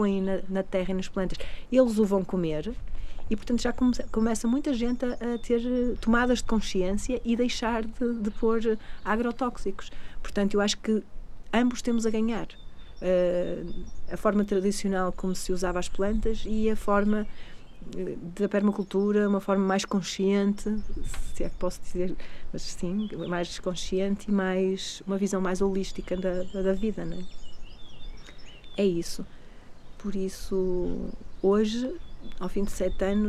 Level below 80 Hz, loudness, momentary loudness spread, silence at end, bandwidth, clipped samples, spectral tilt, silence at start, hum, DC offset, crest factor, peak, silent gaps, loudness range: -38 dBFS; -28 LUFS; 14 LU; 0 s; 13 kHz; under 0.1%; -5.5 dB/octave; 0 s; none; under 0.1%; 18 dB; -8 dBFS; none; 5 LU